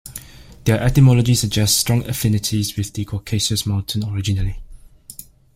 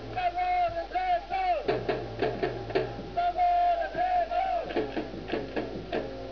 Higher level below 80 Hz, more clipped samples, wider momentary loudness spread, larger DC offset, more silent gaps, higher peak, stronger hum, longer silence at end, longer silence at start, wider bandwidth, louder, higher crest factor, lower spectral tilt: first, -36 dBFS vs -48 dBFS; neither; first, 23 LU vs 9 LU; second, under 0.1% vs 0.2%; neither; first, -2 dBFS vs -14 dBFS; neither; first, 0.35 s vs 0 s; about the same, 0.05 s vs 0 s; first, 16.5 kHz vs 5.4 kHz; first, -18 LUFS vs -30 LUFS; about the same, 16 dB vs 16 dB; second, -4.5 dB/octave vs -6.5 dB/octave